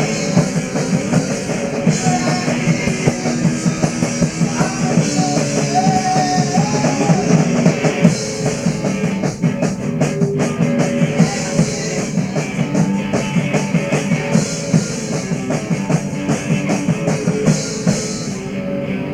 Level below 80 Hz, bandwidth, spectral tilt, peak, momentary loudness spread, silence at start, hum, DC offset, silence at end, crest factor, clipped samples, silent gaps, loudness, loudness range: -44 dBFS; 12.5 kHz; -5.5 dB/octave; 0 dBFS; 5 LU; 0 s; none; under 0.1%; 0 s; 16 dB; under 0.1%; none; -17 LUFS; 3 LU